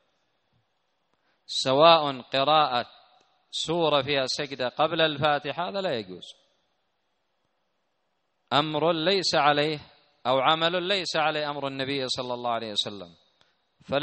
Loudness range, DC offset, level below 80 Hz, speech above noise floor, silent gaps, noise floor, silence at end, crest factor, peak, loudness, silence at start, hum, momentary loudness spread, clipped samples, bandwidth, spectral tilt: 7 LU; under 0.1%; -68 dBFS; 51 dB; none; -76 dBFS; 0 s; 24 dB; -2 dBFS; -25 LUFS; 1.5 s; none; 10 LU; under 0.1%; 8.4 kHz; -4 dB/octave